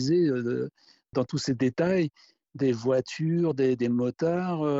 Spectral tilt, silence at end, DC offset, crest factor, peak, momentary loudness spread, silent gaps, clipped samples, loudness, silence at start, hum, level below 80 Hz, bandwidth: -7 dB/octave; 0 s; under 0.1%; 14 dB; -14 dBFS; 7 LU; none; under 0.1%; -27 LUFS; 0 s; none; -66 dBFS; 8 kHz